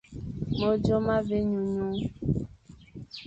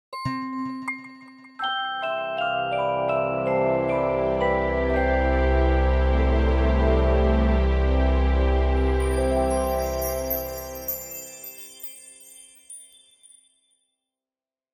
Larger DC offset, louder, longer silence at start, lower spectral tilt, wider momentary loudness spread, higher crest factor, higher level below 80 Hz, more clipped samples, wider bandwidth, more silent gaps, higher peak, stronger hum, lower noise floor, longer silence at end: neither; second, -28 LUFS vs -24 LUFS; about the same, 0.1 s vs 0.1 s; first, -8.5 dB/octave vs -6 dB/octave; about the same, 18 LU vs 16 LU; about the same, 16 dB vs 16 dB; second, -46 dBFS vs -26 dBFS; neither; second, 8 kHz vs 17 kHz; neither; second, -12 dBFS vs -8 dBFS; neither; second, -50 dBFS vs under -90 dBFS; second, 0 s vs 1.9 s